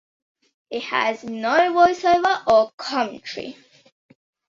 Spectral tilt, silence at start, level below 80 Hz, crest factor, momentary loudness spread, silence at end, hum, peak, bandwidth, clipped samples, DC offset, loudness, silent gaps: -3.5 dB/octave; 0.7 s; -60 dBFS; 20 dB; 16 LU; 0.95 s; none; -2 dBFS; 7.6 kHz; under 0.1%; under 0.1%; -20 LUFS; 2.73-2.78 s